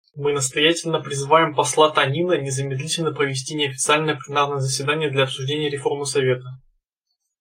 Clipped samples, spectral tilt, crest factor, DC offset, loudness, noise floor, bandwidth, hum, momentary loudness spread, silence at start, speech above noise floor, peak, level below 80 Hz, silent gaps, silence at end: under 0.1%; -3.5 dB/octave; 20 dB; under 0.1%; -20 LUFS; -77 dBFS; 16 kHz; none; 7 LU; 0.15 s; 57 dB; -2 dBFS; -64 dBFS; none; 0.85 s